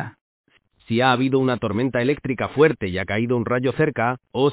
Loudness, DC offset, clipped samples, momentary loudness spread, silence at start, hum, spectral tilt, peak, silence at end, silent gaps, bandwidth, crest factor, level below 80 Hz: -21 LUFS; under 0.1%; under 0.1%; 6 LU; 0 s; none; -10.5 dB/octave; -2 dBFS; 0 s; 0.21-0.44 s; 4 kHz; 20 dB; -50 dBFS